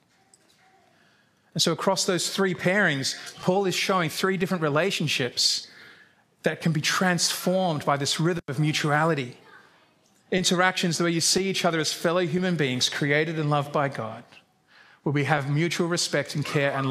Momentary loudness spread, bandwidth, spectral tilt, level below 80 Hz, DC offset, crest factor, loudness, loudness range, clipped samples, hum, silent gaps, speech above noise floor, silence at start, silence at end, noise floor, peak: 7 LU; 15.5 kHz; -4 dB/octave; -68 dBFS; under 0.1%; 22 dB; -24 LUFS; 3 LU; under 0.1%; none; none; 38 dB; 1.55 s; 0 s; -62 dBFS; -4 dBFS